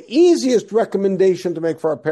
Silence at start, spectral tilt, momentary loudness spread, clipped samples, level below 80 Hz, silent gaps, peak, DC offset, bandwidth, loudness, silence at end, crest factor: 0.1 s; -6 dB/octave; 8 LU; under 0.1%; -66 dBFS; none; -4 dBFS; under 0.1%; 12 kHz; -17 LUFS; 0 s; 12 dB